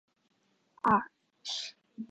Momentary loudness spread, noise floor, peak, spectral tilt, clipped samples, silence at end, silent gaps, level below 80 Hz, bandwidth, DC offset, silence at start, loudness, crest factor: 18 LU; -68 dBFS; -14 dBFS; -3.5 dB/octave; under 0.1%; 0.05 s; none; -68 dBFS; 9 kHz; under 0.1%; 0.85 s; -31 LUFS; 20 dB